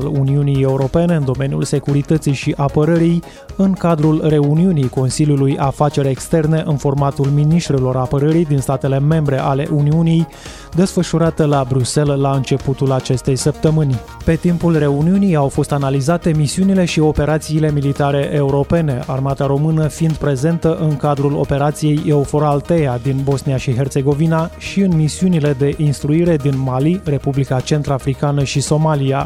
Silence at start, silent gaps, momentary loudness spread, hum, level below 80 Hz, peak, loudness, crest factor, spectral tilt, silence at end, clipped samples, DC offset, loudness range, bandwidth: 0 s; none; 4 LU; none; -36 dBFS; -2 dBFS; -16 LUFS; 14 dB; -7 dB/octave; 0 s; under 0.1%; under 0.1%; 1 LU; 13.5 kHz